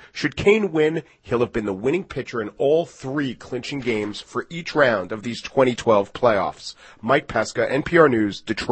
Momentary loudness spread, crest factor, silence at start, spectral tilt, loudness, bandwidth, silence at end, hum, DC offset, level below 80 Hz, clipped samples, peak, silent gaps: 11 LU; 20 dB; 0 s; -5.5 dB/octave; -22 LUFS; 8.8 kHz; 0 s; none; under 0.1%; -50 dBFS; under 0.1%; 0 dBFS; none